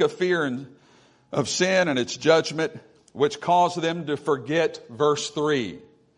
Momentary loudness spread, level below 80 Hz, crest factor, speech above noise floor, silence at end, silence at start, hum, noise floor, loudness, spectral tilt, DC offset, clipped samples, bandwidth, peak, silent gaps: 9 LU; -68 dBFS; 18 dB; 34 dB; 0.35 s; 0 s; none; -57 dBFS; -24 LUFS; -4 dB/octave; under 0.1%; under 0.1%; 11 kHz; -6 dBFS; none